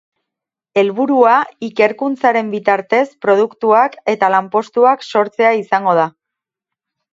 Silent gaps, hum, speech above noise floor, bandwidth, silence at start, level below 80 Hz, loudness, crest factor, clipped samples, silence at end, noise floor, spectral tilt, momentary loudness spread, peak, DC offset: none; none; 69 dB; 7.8 kHz; 0.75 s; -68 dBFS; -14 LUFS; 14 dB; under 0.1%; 1.05 s; -83 dBFS; -6 dB/octave; 4 LU; 0 dBFS; under 0.1%